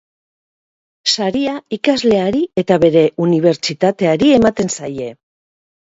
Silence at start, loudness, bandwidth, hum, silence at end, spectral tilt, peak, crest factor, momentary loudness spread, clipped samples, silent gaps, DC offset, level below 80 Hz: 1.05 s; -15 LUFS; 8 kHz; none; 0.85 s; -5 dB/octave; 0 dBFS; 16 dB; 9 LU; under 0.1%; none; under 0.1%; -48 dBFS